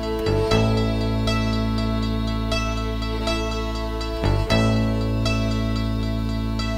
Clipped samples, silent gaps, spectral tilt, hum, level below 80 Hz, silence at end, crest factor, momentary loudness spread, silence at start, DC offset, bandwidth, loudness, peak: under 0.1%; none; -6 dB/octave; none; -28 dBFS; 0 s; 16 dB; 6 LU; 0 s; under 0.1%; 15.5 kHz; -23 LUFS; -6 dBFS